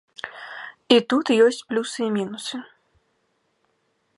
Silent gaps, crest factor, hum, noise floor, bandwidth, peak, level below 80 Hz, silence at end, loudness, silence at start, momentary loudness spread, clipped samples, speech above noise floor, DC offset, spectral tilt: none; 22 dB; none; -70 dBFS; 11.5 kHz; -2 dBFS; -74 dBFS; 1.55 s; -21 LUFS; 0.25 s; 19 LU; under 0.1%; 49 dB; under 0.1%; -4 dB/octave